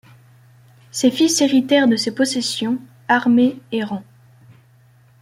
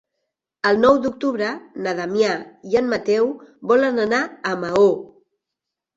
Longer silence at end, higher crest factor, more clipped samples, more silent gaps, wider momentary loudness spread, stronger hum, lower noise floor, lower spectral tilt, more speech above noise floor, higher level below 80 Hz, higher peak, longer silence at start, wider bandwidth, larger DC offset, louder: first, 1.2 s vs 0.9 s; about the same, 16 dB vs 18 dB; neither; neither; about the same, 12 LU vs 10 LU; neither; second, -52 dBFS vs -84 dBFS; second, -3.5 dB/octave vs -5 dB/octave; second, 35 dB vs 64 dB; about the same, -62 dBFS vs -58 dBFS; about the same, -2 dBFS vs -4 dBFS; first, 0.95 s vs 0.65 s; first, 15 kHz vs 7.8 kHz; neither; about the same, -18 LUFS vs -20 LUFS